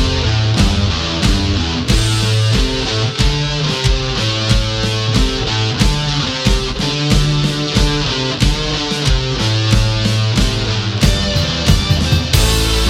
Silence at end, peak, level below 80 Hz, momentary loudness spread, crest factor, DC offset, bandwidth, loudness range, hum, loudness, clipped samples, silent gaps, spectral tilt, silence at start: 0 s; 0 dBFS; -20 dBFS; 3 LU; 14 dB; under 0.1%; 16 kHz; 1 LU; none; -15 LUFS; under 0.1%; none; -4.5 dB/octave; 0 s